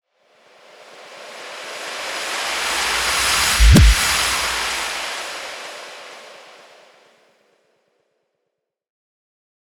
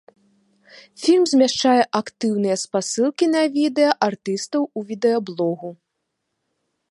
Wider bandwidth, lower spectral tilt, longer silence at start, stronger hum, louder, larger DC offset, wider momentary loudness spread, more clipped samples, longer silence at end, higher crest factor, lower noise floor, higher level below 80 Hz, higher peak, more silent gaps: first, 18 kHz vs 11.5 kHz; about the same, -3 dB/octave vs -4 dB/octave; about the same, 0.8 s vs 0.75 s; neither; first, -17 LUFS vs -20 LUFS; neither; first, 24 LU vs 8 LU; neither; first, 3.3 s vs 1.15 s; about the same, 20 dB vs 20 dB; about the same, -78 dBFS vs -77 dBFS; first, -24 dBFS vs -70 dBFS; about the same, 0 dBFS vs -2 dBFS; neither